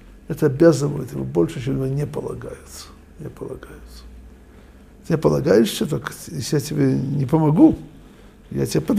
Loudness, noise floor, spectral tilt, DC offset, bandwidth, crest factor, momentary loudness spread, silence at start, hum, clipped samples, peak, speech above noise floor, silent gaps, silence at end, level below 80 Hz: -20 LUFS; -45 dBFS; -7 dB/octave; under 0.1%; 15.5 kHz; 20 dB; 22 LU; 0.05 s; none; under 0.1%; -2 dBFS; 25 dB; none; 0 s; -44 dBFS